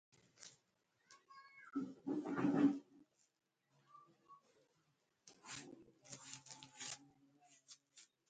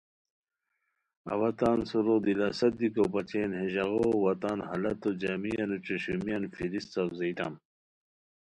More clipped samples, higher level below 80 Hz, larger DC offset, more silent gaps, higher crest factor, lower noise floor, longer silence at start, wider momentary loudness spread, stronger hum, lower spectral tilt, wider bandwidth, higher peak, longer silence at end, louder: neither; second, -88 dBFS vs -62 dBFS; neither; neither; first, 24 dB vs 18 dB; about the same, -82 dBFS vs -81 dBFS; second, 0.4 s vs 1.25 s; first, 26 LU vs 7 LU; neither; second, -5 dB/octave vs -7 dB/octave; second, 9 kHz vs 11 kHz; second, -24 dBFS vs -14 dBFS; second, 0.3 s vs 1 s; second, -43 LUFS vs -31 LUFS